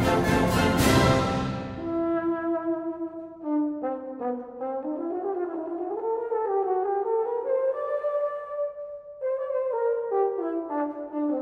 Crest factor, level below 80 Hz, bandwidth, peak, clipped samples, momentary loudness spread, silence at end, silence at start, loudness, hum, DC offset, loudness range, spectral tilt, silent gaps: 18 dB; -46 dBFS; 15.5 kHz; -8 dBFS; under 0.1%; 10 LU; 0 s; 0 s; -27 LUFS; none; under 0.1%; 5 LU; -6 dB/octave; none